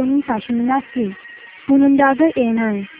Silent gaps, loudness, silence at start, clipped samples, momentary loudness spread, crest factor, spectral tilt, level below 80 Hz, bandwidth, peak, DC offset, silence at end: none; -17 LUFS; 0 s; under 0.1%; 15 LU; 16 dB; -10.5 dB/octave; -54 dBFS; 3.8 kHz; -2 dBFS; under 0.1%; 0.05 s